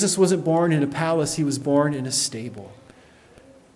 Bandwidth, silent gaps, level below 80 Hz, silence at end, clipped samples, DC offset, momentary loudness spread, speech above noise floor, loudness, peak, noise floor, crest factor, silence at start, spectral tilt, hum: 12 kHz; none; -60 dBFS; 1 s; under 0.1%; under 0.1%; 11 LU; 29 dB; -21 LUFS; -6 dBFS; -51 dBFS; 16 dB; 0 s; -4.5 dB/octave; none